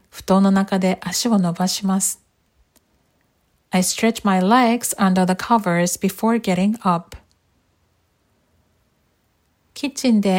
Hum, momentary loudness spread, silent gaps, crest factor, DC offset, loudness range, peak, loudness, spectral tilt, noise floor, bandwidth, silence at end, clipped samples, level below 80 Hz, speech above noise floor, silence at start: none; 7 LU; none; 18 dB; under 0.1%; 8 LU; -4 dBFS; -19 LUFS; -5 dB/octave; -65 dBFS; 16.5 kHz; 0 s; under 0.1%; -56 dBFS; 47 dB; 0.15 s